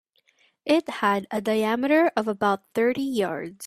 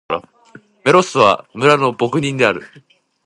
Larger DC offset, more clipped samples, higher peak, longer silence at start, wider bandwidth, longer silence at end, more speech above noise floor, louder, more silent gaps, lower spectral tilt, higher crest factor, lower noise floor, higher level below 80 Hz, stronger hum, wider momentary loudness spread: neither; neither; second, -8 dBFS vs 0 dBFS; first, 0.65 s vs 0.1 s; first, 15 kHz vs 11.5 kHz; second, 0 s vs 0.6 s; first, 41 dB vs 31 dB; second, -24 LUFS vs -15 LUFS; neither; about the same, -5 dB/octave vs -5 dB/octave; about the same, 18 dB vs 16 dB; first, -64 dBFS vs -45 dBFS; second, -68 dBFS vs -56 dBFS; neither; second, 6 LU vs 11 LU